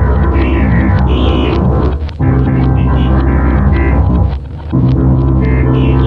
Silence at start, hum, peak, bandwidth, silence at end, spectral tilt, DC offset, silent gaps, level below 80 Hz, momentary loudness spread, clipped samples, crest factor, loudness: 0 s; none; 0 dBFS; 4.8 kHz; 0 s; -10 dB/octave; under 0.1%; none; -14 dBFS; 3 LU; under 0.1%; 10 dB; -11 LUFS